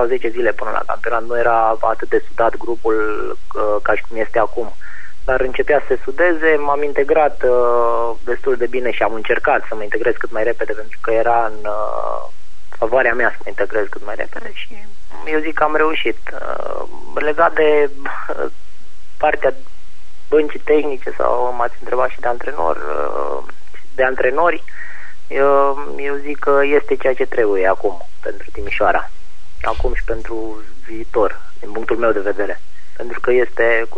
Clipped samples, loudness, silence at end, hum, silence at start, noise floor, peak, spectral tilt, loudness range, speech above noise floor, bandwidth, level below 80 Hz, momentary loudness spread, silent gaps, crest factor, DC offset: under 0.1%; -18 LUFS; 0.05 s; none; 0 s; -48 dBFS; -2 dBFS; -6 dB/octave; 5 LU; 30 dB; 9.6 kHz; -36 dBFS; 14 LU; none; 18 dB; 20%